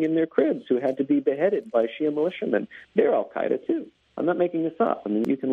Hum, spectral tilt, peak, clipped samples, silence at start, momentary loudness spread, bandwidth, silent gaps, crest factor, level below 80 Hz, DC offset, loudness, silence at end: none; -8.5 dB/octave; -8 dBFS; under 0.1%; 0 s; 5 LU; 5.6 kHz; none; 16 dB; -70 dBFS; under 0.1%; -25 LUFS; 0 s